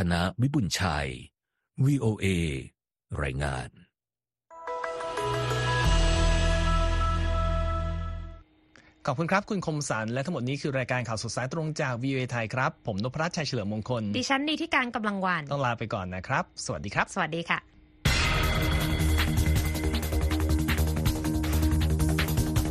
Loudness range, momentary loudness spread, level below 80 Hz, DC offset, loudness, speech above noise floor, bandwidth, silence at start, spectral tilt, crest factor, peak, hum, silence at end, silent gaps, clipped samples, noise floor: 4 LU; 8 LU; -34 dBFS; under 0.1%; -28 LUFS; over 61 dB; 14 kHz; 0 s; -5 dB/octave; 18 dB; -8 dBFS; none; 0 s; none; under 0.1%; under -90 dBFS